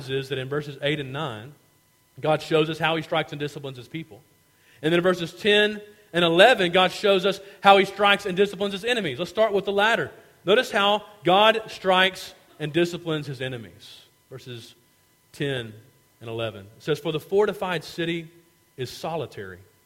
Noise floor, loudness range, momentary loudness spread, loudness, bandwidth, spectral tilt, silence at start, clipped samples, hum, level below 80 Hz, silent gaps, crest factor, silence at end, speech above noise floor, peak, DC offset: -62 dBFS; 12 LU; 19 LU; -23 LUFS; 16.5 kHz; -5 dB/octave; 0 s; under 0.1%; none; -62 dBFS; none; 24 dB; 0.3 s; 38 dB; 0 dBFS; under 0.1%